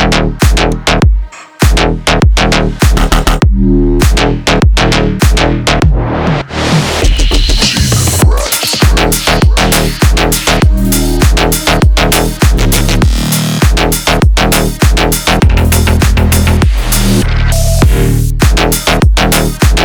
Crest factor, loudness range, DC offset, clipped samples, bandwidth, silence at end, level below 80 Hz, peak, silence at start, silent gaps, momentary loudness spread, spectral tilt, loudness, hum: 8 dB; 1 LU; under 0.1%; under 0.1%; over 20 kHz; 0 s; -12 dBFS; 0 dBFS; 0 s; none; 2 LU; -4.5 dB/octave; -9 LUFS; none